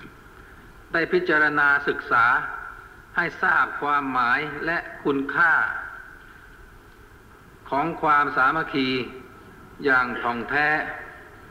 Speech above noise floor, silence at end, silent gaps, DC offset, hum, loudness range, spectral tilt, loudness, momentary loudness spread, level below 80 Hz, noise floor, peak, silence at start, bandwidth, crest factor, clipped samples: 26 dB; 0 s; none; under 0.1%; none; 4 LU; -5.5 dB/octave; -22 LUFS; 15 LU; -52 dBFS; -48 dBFS; -10 dBFS; 0 s; 16 kHz; 16 dB; under 0.1%